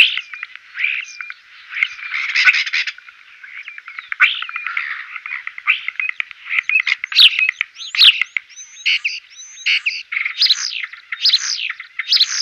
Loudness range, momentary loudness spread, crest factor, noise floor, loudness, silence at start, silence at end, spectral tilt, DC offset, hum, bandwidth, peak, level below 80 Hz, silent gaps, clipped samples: 7 LU; 21 LU; 18 dB; -42 dBFS; -15 LUFS; 0 s; 0 s; 6.5 dB/octave; under 0.1%; none; 16 kHz; 0 dBFS; -76 dBFS; none; under 0.1%